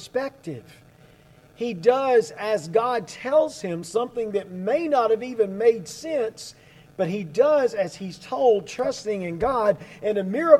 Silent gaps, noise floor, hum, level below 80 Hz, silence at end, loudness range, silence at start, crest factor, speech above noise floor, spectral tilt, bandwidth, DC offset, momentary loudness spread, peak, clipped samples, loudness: none; -53 dBFS; none; -58 dBFS; 0 s; 1 LU; 0 s; 22 dB; 30 dB; -5.5 dB/octave; 13.5 kHz; under 0.1%; 11 LU; -2 dBFS; under 0.1%; -24 LUFS